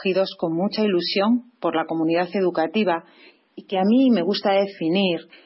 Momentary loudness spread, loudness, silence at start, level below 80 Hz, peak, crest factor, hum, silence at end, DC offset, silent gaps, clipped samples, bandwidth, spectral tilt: 6 LU; -21 LUFS; 0 s; -72 dBFS; -10 dBFS; 12 dB; none; 0.25 s; under 0.1%; none; under 0.1%; 5.8 kHz; -9.5 dB/octave